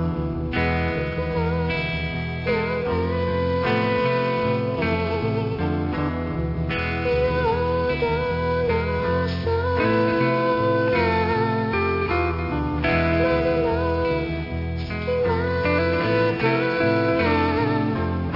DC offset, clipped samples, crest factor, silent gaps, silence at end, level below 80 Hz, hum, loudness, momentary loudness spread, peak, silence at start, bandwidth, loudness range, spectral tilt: under 0.1%; under 0.1%; 14 dB; none; 0 s; -38 dBFS; none; -22 LUFS; 5 LU; -8 dBFS; 0 s; 5.8 kHz; 2 LU; -9 dB/octave